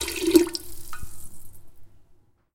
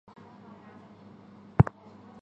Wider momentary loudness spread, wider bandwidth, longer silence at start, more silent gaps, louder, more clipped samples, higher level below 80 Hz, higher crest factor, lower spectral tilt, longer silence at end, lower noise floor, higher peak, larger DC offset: about the same, 25 LU vs 26 LU; first, 17 kHz vs 4.8 kHz; second, 0 s vs 1.6 s; neither; first, -22 LUFS vs -26 LUFS; neither; about the same, -46 dBFS vs -46 dBFS; about the same, 24 dB vs 28 dB; second, -3.5 dB/octave vs -10.5 dB/octave; second, 0.4 s vs 0.6 s; first, -57 dBFS vs -51 dBFS; about the same, -2 dBFS vs -4 dBFS; neither